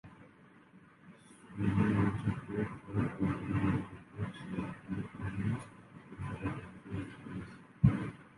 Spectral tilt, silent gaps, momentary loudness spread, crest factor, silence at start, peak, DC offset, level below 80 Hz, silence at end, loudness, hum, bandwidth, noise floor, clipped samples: -8.5 dB/octave; none; 20 LU; 26 dB; 0.05 s; -12 dBFS; under 0.1%; -52 dBFS; 0.1 s; -36 LUFS; none; 11.5 kHz; -60 dBFS; under 0.1%